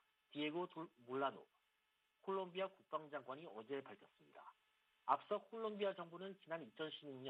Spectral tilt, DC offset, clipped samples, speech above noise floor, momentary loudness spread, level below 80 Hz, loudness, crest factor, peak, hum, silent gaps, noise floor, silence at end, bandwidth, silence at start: -7 dB/octave; under 0.1%; under 0.1%; 37 dB; 20 LU; under -90 dBFS; -47 LUFS; 26 dB; -22 dBFS; none; none; -84 dBFS; 0 s; 8.8 kHz; 0.3 s